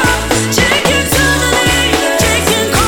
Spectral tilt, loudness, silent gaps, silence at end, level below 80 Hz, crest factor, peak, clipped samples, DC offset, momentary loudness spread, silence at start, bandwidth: -3 dB/octave; -11 LUFS; none; 0 s; -24 dBFS; 12 dB; 0 dBFS; under 0.1%; under 0.1%; 2 LU; 0 s; 19 kHz